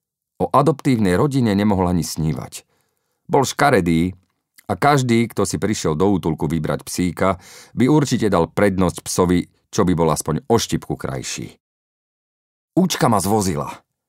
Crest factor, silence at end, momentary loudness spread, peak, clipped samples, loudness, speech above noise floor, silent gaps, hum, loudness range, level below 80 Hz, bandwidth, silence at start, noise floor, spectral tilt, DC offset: 18 dB; 0.3 s; 10 LU; -2 dBFS; under 0.1%; -19 LUFS; 51 dB; 11.60-12.68 s; none; 4 LU; -44 dBFS; 16 kHz; 0.4 s; -69 dBFS; -5.5 dB/octave; under 0.1%